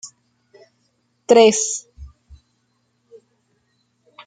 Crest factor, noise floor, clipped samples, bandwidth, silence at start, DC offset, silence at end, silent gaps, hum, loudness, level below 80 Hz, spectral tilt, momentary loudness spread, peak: 20 dB; -67 dBFS; under 0.1%; 9.6 kHz; 0.05 s; under 0.1%; 2.2 s; none; none; -15 LUFS; -52 dBFS; -2.5 dB/octave; 26 LU; -2 dBFS